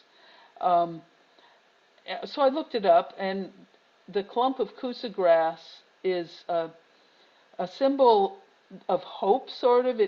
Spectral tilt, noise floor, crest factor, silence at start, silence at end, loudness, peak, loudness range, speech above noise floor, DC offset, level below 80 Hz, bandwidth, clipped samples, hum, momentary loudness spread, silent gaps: -3.5 dB/octave; -62 dBFS; 18 dB; 0.6 s; 0 s; -26 LUFS; -8 dBFS; 2 LU; 36 dB; under 0.1%; -78 dBFS; 6.8 kHz; under 0.1%; none; 15 LU; none